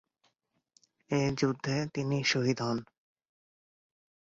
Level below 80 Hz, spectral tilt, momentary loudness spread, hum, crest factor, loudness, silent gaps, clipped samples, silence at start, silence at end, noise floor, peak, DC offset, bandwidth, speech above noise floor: -66 dBFS; -5 dB/octave; 6 LU; none; 18 dB; -31 LUFS; none; under 0.1%; 1.1 s; 1.5 s; -77 dBFS; -16 dBFS; under 0.1%; 7.8 kHz; 47 dB